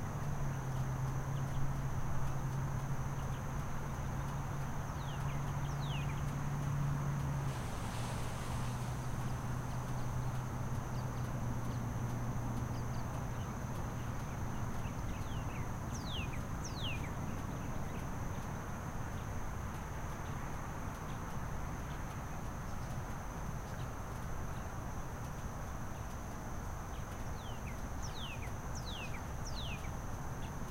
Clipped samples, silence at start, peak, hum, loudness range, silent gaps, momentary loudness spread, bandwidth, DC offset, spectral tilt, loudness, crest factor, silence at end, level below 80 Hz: under 0.1%; 0 s; -24 dBFS; none; 5 LU; none; 5 LU; 16 kHz; under 0.1%; -5.5 dB/octave; -41 LUFS; 14 dB; 0 s; -46 dBFS